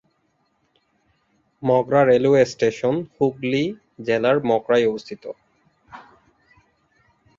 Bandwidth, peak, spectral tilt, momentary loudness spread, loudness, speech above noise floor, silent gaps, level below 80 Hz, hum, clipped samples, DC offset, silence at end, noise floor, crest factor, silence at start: 7.6 kHz; -4 dBFS; -6.5 dB/octave; 16 LU; -20 LUFS; 48 dB; none; -62 dBFS; none; under 0.1%; under 0.1%; 1.4 s; -68 dBFS; 18 dB; 1.6 s